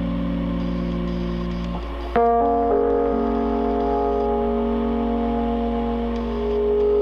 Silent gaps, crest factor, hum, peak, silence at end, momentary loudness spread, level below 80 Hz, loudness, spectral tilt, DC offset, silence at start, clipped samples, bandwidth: none; 14 dB; none; -6 dBFS; 0 s; 7 LU; -32 dBFS; -22 LUFS; -9 dB/octave; under 0.1%; 0 s; under 0.1%; 6.4 kHz